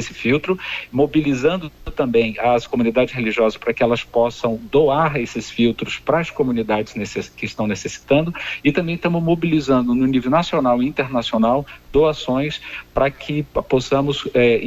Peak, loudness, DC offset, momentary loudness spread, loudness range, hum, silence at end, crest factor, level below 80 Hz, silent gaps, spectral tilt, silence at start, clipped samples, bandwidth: -2 dBFS; -19 LUFS; under 0.1%; 7 LU; 3 LU; none; 0 s; 16 dB; -42 dBFS; none; -6 dB/octave; 0 s; under 0.1%; 15 kHz